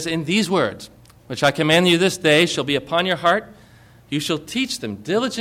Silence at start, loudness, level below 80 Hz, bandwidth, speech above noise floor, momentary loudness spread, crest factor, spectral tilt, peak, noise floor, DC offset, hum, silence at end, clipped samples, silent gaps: 0 s; -19 LUFS; -56 dBFS; 16.5 kHz; 29 dB; 10 LU; 16 dB; -4 dB/octave; -4 dBFS; -48 dBFS; under 0.1%; none; 0 s; under 0.1%; none